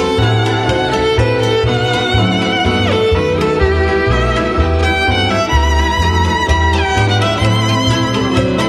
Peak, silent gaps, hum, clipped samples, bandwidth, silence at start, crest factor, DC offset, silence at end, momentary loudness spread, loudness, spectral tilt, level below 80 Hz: 0 dBFS; none; none; under 0.1%; 12.5 kHz; 0 s; 12 dB; under 0.1%; 0 s; 1 LU; -13 LUFS; -5.5 dB/octave; -22 dBFS